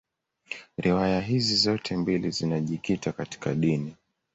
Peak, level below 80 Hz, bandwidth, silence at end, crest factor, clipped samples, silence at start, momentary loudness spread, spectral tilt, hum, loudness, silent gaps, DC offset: -10 dBFS; -54 dBFS; 8.2 kHz; 0.4 s; 18 dB; under 0.1%; 0.5 s; 12 LU; -5.5 dB/octave; none; -26 LUFS; none; under 0.1%